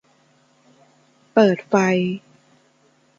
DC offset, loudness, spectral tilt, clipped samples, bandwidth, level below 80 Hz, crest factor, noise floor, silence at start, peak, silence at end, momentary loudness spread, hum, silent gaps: under 0.1%; -19 LUFS; -6.5 dB/octave; under 0.1%; 7.4 kHz; -68 dBFS; 20 dB; -59 dBFS; 1.35 s; -2 dBFS; 1 s; 9 LU; none; none